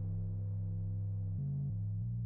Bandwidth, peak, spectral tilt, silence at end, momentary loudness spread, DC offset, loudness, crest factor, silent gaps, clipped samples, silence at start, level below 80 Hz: 1.2 kHz; -32 dBFS; -16 dB/octave; 0 s; 1 LU; under 0.1%; -39 LUFS; 4 dB; none; under 0.1%; 0 s; -50 dBFS